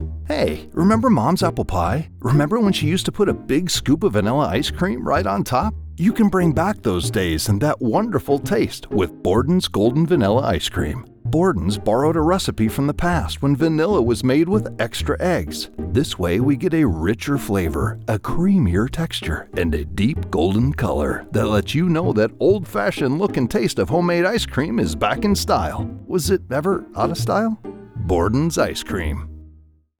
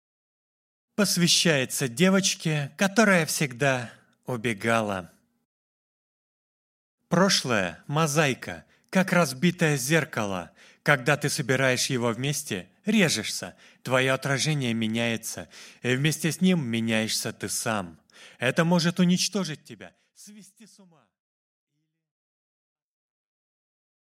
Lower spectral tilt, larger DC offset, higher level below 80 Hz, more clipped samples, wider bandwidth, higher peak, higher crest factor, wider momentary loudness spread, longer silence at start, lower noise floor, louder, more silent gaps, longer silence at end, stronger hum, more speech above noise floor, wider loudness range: first, -6 dB/octave vs -4 dB/octave; neither; first, -36 dBFS vs -68 dBFS; neither; first, over 20 kHz vs 16 kHz; about the same, -4 dBFS vs -2 dBFS; second, 16 dB vs 24 dB; second, 6 LU vs 13 LU; second, 0 s vs 1 s; second, -50 dBFS vs under -90 dBFS; first, -20 LUFS vs -25 LUFS; second, none vs 5.45-6.98 s; second, 0.5 s vs 3.4 s; neither; second, 31 dB vs over 65 dB; second, 2 LU vs 6 LU